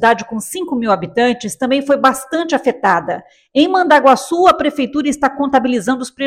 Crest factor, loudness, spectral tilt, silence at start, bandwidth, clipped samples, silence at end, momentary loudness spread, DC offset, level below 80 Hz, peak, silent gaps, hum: 14 dB; -14 LUFS; -4 dB/octave; 0 s; 16 kHz; under 0.1%; 0 s; 9 LU; under 0.1%; -52 dBFS; 0 dBFS; none; none